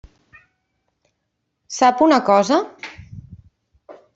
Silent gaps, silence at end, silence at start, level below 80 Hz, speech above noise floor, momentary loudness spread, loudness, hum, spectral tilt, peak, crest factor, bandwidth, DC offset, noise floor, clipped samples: none; 0.25 s; 1.7 s; -56 dBFS; 59 dB; 26 LU; -16 LUFS; none; -4.5 dB/octave; -2 dBFS; 18 dB; 8 kHz; under 0.1%; -75 dBFS; under 0.1%